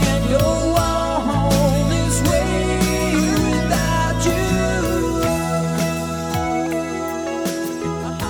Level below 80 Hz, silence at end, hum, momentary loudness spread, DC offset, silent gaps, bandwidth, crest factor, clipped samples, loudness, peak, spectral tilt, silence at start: -28 dBFS; 0 s; none; 6 LU; under 0.1%; none; 19 kHz; 14 dB; under 0.1%; -19 LUFS; -4 dBFS; -5 dB/octave; 0 s